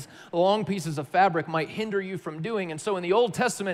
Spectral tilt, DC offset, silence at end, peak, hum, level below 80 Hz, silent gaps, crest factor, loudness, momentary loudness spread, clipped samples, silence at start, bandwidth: -5 dB/octave; under 0.1%; 0 s; -10 dBFS; none; -72 dBFS; none; 16 dB; -26 LUFS; 8 LU; under 0.1%; 0 s; 15.5 kHz